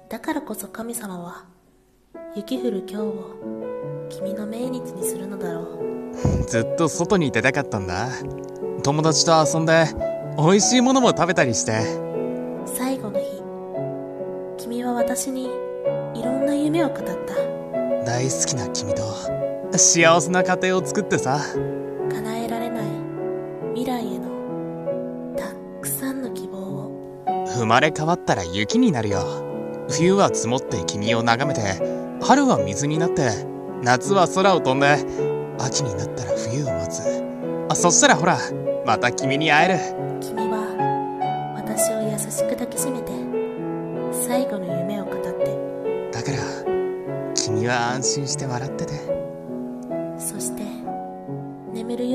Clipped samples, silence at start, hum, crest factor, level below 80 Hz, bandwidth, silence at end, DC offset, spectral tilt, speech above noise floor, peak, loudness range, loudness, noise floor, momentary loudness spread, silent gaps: under 0.1%; 0.1 s; none; 22 dB; -50 dBFS; 14.5 kHz; 0 s; under 0.1%; -4 dB/octave; 37 dB; 0 dBFS; 9 LU; -22 LUFS; -57 dBFS; 13 LU; none